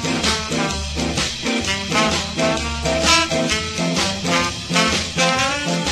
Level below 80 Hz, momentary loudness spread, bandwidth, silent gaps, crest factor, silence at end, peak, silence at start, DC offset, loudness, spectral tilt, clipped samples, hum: -34 dBFS; 6 LU; 13 kHz; none; 20 dB; 0 s; 0 dBFS; 0 s; under 0.1%; -18 LUFS; -3 dB/octave; under 0.1%; none